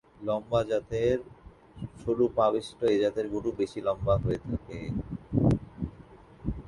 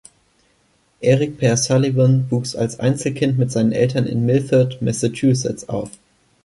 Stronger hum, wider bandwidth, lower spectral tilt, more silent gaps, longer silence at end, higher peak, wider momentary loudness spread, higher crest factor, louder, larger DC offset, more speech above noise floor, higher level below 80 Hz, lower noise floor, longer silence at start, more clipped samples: neither; about the same, 11.5 kHz vs 11.5 kHz; first, -8 dB/octave vs -6 dB/octave; neither; second, 0 s vs 0.55 s; second, -12 dBFS vs -4 dBFS; first, 12 LU vs 7 LU; about the same, 18 dB vs 14 dB; second, -29 LUFS vs -18 LUFS; neither; second, 23 dB vs 43 dB; first, -46 dBFS vs -52 dBFS; second, -51 dBFS vs -60 dBFS; second, 0.2 s vs 1 s; neither